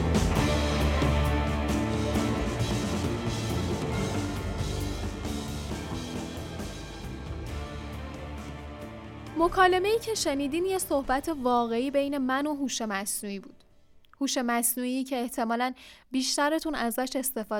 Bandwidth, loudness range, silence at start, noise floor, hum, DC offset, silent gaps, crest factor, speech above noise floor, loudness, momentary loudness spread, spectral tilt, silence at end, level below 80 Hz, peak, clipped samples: 18 kHz; 9 LU; 0 s; -56 dBFS; none; under 0.1%; none; 20 dB; 28 dB; -29 LUFS; 13 LU; -4.5 dB/octave; 0 s; -40 dBFS; -10 dBFS; under 0.1%